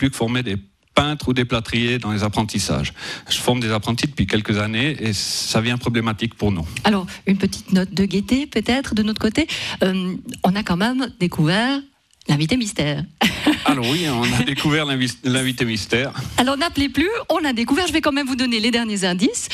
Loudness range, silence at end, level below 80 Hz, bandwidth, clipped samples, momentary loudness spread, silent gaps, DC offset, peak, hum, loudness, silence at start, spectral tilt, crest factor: 2 LU; 0 s; -42 dBFS; 14.5 kHz; under 0.1%; 4 LU; none; under 0.1%; -2 dBFS; none; -20 LUFS; 0 s; -4.5 dB/octave; 18 dB